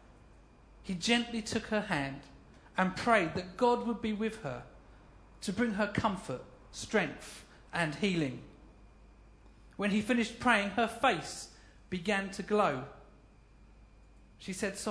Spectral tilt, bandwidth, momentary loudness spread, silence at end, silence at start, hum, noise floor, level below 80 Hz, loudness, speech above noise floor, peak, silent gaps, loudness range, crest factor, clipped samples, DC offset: -4.5 dB/octave; 11 kHz; 18 LU; 0 s; 0.3 s; none; -59 dBFS; -58 dBFS; -33 LUFS; 26 dB; -10 dBFS; none; 5 LU; 24 dB; under 0.1%; under 0.1%